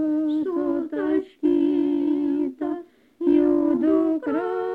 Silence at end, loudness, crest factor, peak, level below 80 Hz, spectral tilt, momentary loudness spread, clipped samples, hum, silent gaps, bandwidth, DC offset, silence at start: 0 s; -23 LUFS; 14 dB; -8 dBFS; -58 dBFS; -8 dB/octave; 7 LU; under 0.1%; none; none; 4.3 kHz; under 0.1%; 0 s